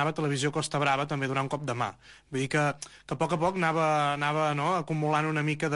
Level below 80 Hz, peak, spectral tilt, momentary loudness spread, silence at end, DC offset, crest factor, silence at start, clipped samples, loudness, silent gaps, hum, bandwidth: -62 dBFS; -14 dBFS; -5.5 dB/octave; 7 LU; 0 s; under 0.1%; 14 dB; 0 s; under 0.1%; -28 LUFS; none; none; 11.5 kHz